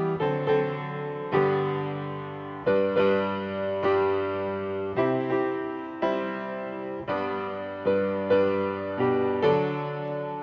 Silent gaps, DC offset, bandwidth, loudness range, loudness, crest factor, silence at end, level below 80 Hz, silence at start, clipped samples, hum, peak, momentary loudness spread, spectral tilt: none; under 0.1%; 6.2 kHz; 3 LU; -27 LUFS; 16 dB; 0 s; -58 dBFS; 0 s; under 0.1%; none; -10 dBFS; 10 LU; -8.5 dB/octave